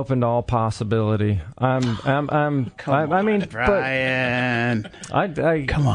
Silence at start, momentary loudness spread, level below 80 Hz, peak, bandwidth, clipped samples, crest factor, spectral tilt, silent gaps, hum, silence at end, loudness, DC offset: 0 s; 4 LU; -42 dBFS; -6 dBFS; 10.5 kHz; under 0.1%; 16 dB; -7 dB/octave; none; none; 0 s; -21 LUFS; under 0.1%